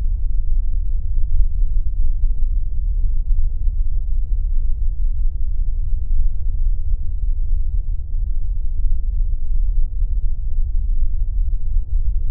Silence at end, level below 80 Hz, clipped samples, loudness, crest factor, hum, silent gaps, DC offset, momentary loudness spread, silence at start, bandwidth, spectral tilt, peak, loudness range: 0 s; -16 dBFS; under 0.1%; -25 LUFS; 12 dB; none; none; under 0.1%; 2 LU; 0 s; 0.5 kHz; -18 dB/octave; -2 dBFS; 1 LU